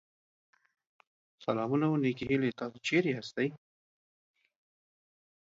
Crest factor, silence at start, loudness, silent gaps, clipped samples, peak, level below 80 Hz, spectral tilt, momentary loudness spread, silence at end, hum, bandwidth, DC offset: 18 dB; 1.4 s; -32 LUFS; none; under 0.1%; -16 dBFS; -70 dBFS; -6.5 dB/octave; 6 LU; 1.95 s; none; 7.8 kHz; under 0.1%